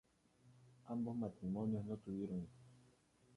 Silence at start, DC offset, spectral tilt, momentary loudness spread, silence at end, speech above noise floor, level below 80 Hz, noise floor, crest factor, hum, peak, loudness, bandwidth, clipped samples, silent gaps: 0.45 s; under 0.1%; -10 dB/octave; 14 LU; 0.55 s; 29 dB; -72 dBFS; -72 dBFS; 16 dB; none; -30 dBFS; -45 LUFS; 11 kHz; under 0.1%; none